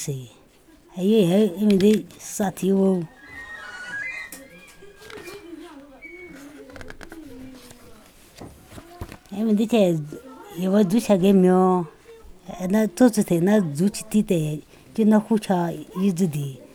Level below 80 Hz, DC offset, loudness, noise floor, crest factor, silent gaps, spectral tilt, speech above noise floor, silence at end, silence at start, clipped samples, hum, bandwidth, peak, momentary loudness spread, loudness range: -54 dBFS; under 0.1%; -21 LUFS; -53 dBFS; 18 dB; none; -6.5 dB/octave; 33 dB; 0.1 s; 0 s; under 0.1%; none; 17.5 kHz; -4 dBFS; 23 LU; 21 LU